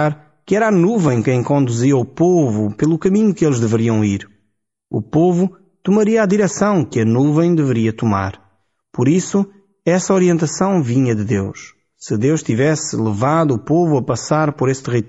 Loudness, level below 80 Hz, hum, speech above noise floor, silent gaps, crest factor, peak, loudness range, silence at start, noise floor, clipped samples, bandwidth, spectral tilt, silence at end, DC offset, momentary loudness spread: -16 LUFS; -52 dBFS; none; 54 dB; none; 12 dB; -4 dBFS; 2 LU; 0 s; -70 dBFS; under 0.1%; 8 kHz; -7 dB/octave; 0 s; under 0.1%; 7 LU